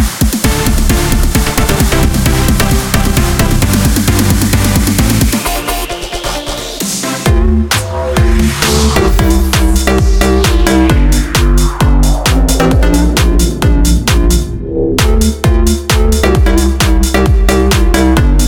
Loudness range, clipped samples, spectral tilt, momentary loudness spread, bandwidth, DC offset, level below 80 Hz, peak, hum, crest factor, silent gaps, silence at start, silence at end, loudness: 3 LU; under 0.1%; -5 dB/octave; 5 LU; over 20 kHz; under 0.1%; -12 dBFS; 0 dBFS; none; 10 dB; none; 0 s; 0 s; -11 LUFS